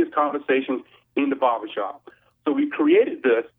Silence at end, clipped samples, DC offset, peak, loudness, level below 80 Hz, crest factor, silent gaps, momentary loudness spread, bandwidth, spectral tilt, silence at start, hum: 0.1 s; under 0.1%; under 0.1%; -6 dBFS; -23 LUFS; -76 dBFS; 16 dB; none; 12 LU; 3.9 kHz; -8 dB/octave; 0 s; none